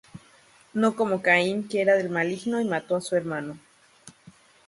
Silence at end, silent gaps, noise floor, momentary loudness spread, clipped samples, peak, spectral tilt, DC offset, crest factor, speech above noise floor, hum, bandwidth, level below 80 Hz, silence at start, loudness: 0.35 s; none; -56 dBFS; 12 LU; under 0.1%; -6 dBFS; -5.5 dB/octave; under 0.1%; 22 dB; 32 dB; none; 11.5 kHz; -70 dBFS; 0.15 s; -25 LUFS